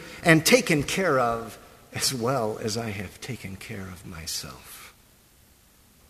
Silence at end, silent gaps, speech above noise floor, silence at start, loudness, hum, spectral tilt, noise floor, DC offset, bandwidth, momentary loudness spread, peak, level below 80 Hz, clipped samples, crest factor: 1.2 s; none; 32 dB; 0 s; -24 LUFS; none; -4 dB/octave; -57 dBFS; under 0.1%; 15.5 kHz; 20 LU; -4 dBFS; -54 dBFS; under 0.1%; 24 dB